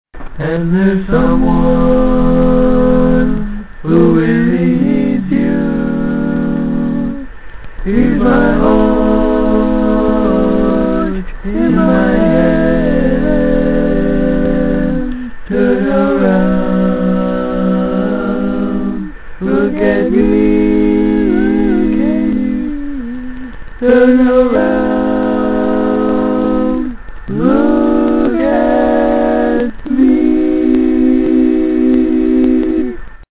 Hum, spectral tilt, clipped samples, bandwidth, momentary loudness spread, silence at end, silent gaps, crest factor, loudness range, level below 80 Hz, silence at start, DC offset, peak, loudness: none; -12 dB/octave; under 0.1%; 4 kHz; 9 LU; 0.15 s; none; 12 dB; 3 LU; -26 dBFS; 0.15 s; under 0.1%; 0 dBFS; -12 LUFS